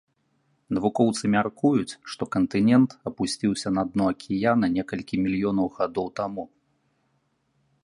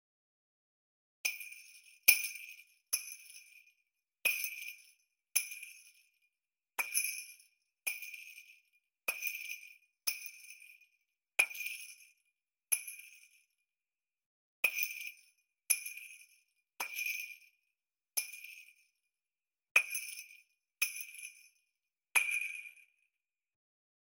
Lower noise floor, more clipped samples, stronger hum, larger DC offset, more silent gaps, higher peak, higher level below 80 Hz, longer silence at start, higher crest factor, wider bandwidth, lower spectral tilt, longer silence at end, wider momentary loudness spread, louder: second, -71 dBFS vs under -90 dBFS; neither; neither; neither; second, none vs 14.26-14.63 s, 19.71-19.75 s; about the same, -6 dBFS vs -6 dBFS; first, -56 dBFS vs under -90 dBFS; second, 0.7 s vs 1.25 s; second, 18 dB vs 36 dB; second, 11.5 kHz vs 17.5 kHz; first, -6 dB/octave vs 4.5 dB/octave; first, 1.4 s vs 1.25 s; second, 10 LU vs 22 LU; first, -25 LUFS vs -35 LUFS